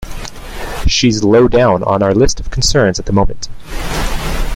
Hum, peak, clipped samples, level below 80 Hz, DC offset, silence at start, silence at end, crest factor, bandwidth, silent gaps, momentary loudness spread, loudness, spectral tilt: none; 0 dBFS; under 0.1%; -22 dBFS; under 0.1%; 0 s; 0 s; 12 dB; 16 kHz; none; 17 LU; -13 LUFS; -4.5 dB/octave